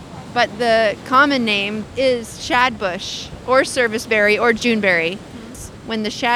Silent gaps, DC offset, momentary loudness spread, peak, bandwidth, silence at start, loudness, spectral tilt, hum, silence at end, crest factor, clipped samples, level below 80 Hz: none; under 0.1%; 12 LU; -2 dBFS; 15 kHz; 0 s; -17 LUFS; -3.5 dB/octave; none; 0 s; 16 dB; under 0.1%; -48 dBFS